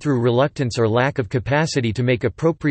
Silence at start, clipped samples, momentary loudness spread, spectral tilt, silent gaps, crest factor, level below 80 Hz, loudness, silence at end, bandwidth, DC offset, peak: 0 s; under 0.1%; 3 LU; -6.5 dB/octave; none; 14 dB; -48 dBFS; -20 LUFS; 0 s; 8.8 kHz; under 0.1%; -4 dBFS